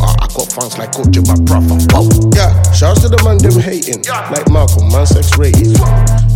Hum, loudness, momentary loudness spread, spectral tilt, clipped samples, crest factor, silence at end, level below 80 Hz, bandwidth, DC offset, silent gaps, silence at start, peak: none; -10 LUFS; 7 LU; -5.5 dB/octave; under 0.1%; 8 dB; 0 s; -16 dBFS; 17 kHz; under 0.1%; none; 0 s; 0 dBFS